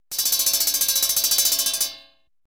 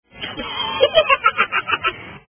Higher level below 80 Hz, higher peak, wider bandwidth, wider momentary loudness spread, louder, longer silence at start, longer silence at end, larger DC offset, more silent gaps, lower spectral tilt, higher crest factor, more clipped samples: second, -58 dBFS vs -50 dBFS; second, -6 dBFS vs 0 dBFS; first, 19.5 kHz vs 3.5 kHz; second, 5 LU vs 12 LU; about the same, -18 LUFS vs -17 LUFS; about the same, 0.1 s vs 0.15 s; first, 0.55 s vs 0.1 s; first, 0.1% vs under 0.1%; neither; second, 2.5 dB/octave vs -6.5 dB/octave; about the same, 18 dB vs 20 dB; neither